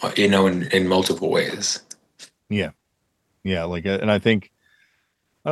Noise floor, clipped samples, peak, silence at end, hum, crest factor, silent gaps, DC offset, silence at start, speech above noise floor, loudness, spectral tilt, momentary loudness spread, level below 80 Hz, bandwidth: -72 dBFS; under 0.1%; -2 dBFS; 0 s; none; 20 dB; none; under 0.1%; 0 s; 52 dB; -21 LUFS; -4.5 dB/octave; 12 LU; -56 dBFS; 12.5 kHz